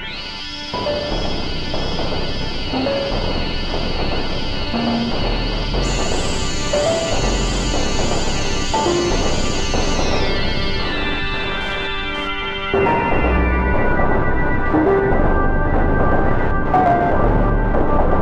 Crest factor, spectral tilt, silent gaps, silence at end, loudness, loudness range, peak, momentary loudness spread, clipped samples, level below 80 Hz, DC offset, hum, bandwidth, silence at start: 14 dB; -4.5 dB/octave; none; 0 s; -19 LUFS; 5 LU; -2 dBFS; 6 LU; under 0.1%; -22 dBFS; 0.4%; none; 9.6 kHz; 0 s